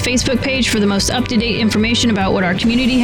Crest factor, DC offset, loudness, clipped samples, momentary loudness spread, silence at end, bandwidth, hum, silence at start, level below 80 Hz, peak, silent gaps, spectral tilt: 10 dB; 0.6%; -15 LUFS; under 0.1%; 2 LU; 0 s; over 20 kHz; none; 0 s; -32 dBFS; -6 dBFS; none; -4 dB/octave